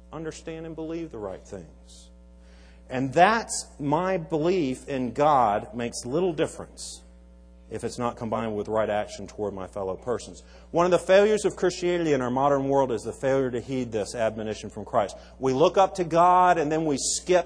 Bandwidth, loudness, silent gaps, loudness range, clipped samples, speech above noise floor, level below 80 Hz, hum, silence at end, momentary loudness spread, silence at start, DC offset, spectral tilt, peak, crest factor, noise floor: 10.5 kHz; -25 LUFS; none; 7 LU; under 0.1%; 25 dB; -50 dBFS; none; 0 s; 16 LU; 0.1 s; under 0.1%; -5 dB/octave; -4 dBFS; 20 dB; -50 dBFS